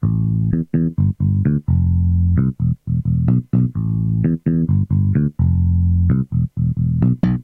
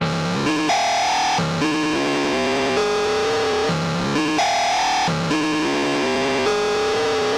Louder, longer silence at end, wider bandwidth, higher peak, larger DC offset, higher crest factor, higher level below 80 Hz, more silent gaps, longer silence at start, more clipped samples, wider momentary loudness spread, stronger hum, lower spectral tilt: about the same, -18 LUFS vs -20 LUFS; about the same, 0 s vs 0 s; second, 2.9 kHz vs 15 kHz; about the same, -6 dBFS vs -8 dBFS; neither; about the same, 10 dB vs 12 dB; first, -30 dBFS vs -50 dBFS; neither; about the same, 0 s vs 0 s; neither; about the same, 3 LU vs 2 LU; neither; first, -12.5 dB/octave vs -4 dB/octave